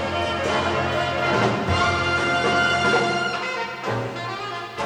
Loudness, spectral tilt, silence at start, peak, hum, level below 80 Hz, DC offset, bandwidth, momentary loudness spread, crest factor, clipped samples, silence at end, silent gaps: -22 LUFS; -4.5 dB/octave; 0 s; -8 dBFS; none; -46 dBFS; under 0.1%; 15.5 kHz; 9 LU; 16 dB; under 0.1%; 0 s; none